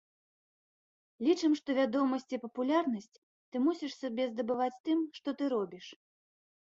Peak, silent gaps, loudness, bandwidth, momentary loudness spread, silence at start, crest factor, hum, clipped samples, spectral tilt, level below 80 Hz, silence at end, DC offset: -16 dBFS; 3.18-3.52 s, 4.80-4.84 s; -33 LUFS; 7.6 kHz; 11 LU; 1.2 s; 18 dB; none; under 0.1%; -5 dB/octave; -82 dBFS; 0.75 s; under 0.1%